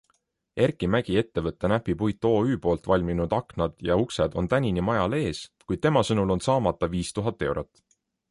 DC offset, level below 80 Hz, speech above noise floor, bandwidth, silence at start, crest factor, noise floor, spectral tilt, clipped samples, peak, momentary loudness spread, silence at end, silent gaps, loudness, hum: under 0.1%; -44 dBFS; 47 dB; 11.5 kHz; 0.55 s; 18 dB; -71 dBFS; -6.5 dB/octave; under 0.1%; -8 dBFS; 7 LU; 0.65 s; none; -26 LUFS; none